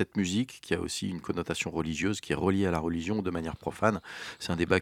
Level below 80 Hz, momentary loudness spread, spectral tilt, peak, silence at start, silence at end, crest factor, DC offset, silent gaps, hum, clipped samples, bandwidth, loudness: -52 dBFS; 7 LU; -5 dB/octave; -8 dBFS; 0 s; 0 s; 24 dB; under 0.1%; none; none; under 0.1%; 16 kHz; -31 LUFS